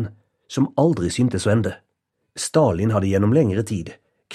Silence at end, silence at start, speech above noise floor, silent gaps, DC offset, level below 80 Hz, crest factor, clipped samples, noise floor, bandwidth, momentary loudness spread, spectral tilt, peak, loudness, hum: 0 s; 0 s; 55 dB; none; under 0.1%; -50 dBFS; 16 dB; under 0.1%; -74 dBFS; 13.5 kHz; 12 LU; -6.5 dB/octave; -4 dBFS; -20 LUFS; none